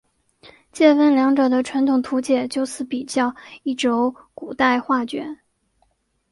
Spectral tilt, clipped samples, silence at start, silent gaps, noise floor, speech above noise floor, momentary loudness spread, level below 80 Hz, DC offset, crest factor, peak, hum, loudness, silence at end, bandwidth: -3.5 dB/octave; under 0.1%; 0.75 s; none; -66 dBFS; 47 dB; 15 LU; -62 dBFS; under 0.1%; 20 dB; -2 dBFS; none; -20 LUFS; 1 s; 11.5 kHz